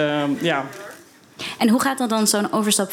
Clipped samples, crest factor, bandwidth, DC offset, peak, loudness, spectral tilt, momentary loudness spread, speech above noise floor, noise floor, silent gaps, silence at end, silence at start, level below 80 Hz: under 0.1%; 16 dB; 18 kHz; under 0.1%; -4 dBFS; -20 LUFS; -3.5 dB/octave; 15 LU; 25 dB; -45 dBFS; none; 0 s; 0 s; -70 dBFS